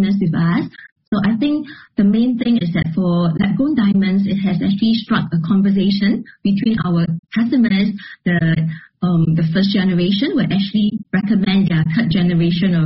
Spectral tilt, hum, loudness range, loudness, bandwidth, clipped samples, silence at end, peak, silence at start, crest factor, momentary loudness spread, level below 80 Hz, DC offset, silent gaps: -6.5 dB/octave; none; 1 LU; -17 LUFS; 5.8 kHz; under 0.1%; 0 s; -4 dBFS; 0 s; 12 dB; 5 LU; -46 dBFS; under 0.1%; 0.92-0.96 s, 1.08-1.12 s, 7.19-7.23 s